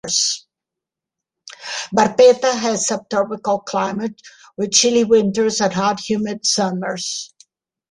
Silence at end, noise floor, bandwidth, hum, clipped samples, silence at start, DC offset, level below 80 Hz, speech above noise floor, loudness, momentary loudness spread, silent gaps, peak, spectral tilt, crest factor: 0.65 s; -85 dBFS; 11.5 kHz; none; under 0.1%; 0.05 s; under 0.1%; -60 dBFS; 68 dB; -18 LUFS; 15 LU; none; -2 dBFS; -3 dB/octave; 18 dB